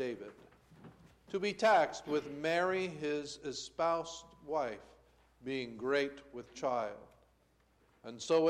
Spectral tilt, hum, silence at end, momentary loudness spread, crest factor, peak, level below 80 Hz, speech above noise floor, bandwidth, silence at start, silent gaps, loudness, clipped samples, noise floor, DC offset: -4 dB/octave; none; 0 s; 19 LU; 18 dB; -18 dBFS; -70 dBFS; 36 dB; 12.5 kHz; 0 s; none; -36 LUFS; under 0.1%; -71 dBFS; under 0.1%